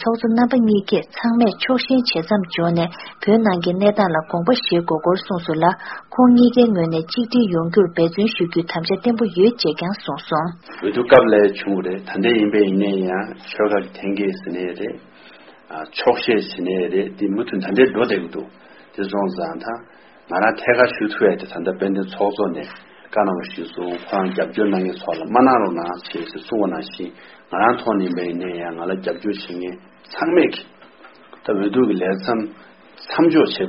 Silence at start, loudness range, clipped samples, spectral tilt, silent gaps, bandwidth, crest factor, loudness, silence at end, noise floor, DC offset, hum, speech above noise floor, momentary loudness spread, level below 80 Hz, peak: 0 s; 6 LU; under 0.1%; -4.5 dB/octave; none; 6 kHz; 18 dB; -19 LUFS; 0 s; -45 dBFS; under 0.1%; none; 27 dB; 13 LU; -56 dBFS; 0 dBFS